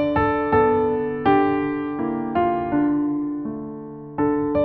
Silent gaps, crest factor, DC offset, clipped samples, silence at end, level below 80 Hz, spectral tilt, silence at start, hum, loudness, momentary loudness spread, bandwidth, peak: none; 16 dB; under 0.1%; under 0.1%; 0 s; -46 dBFS; -6 dB/octave; 0 s; none; -21 LUFS; 12 LU; 4.7 kHz; -6 dBFS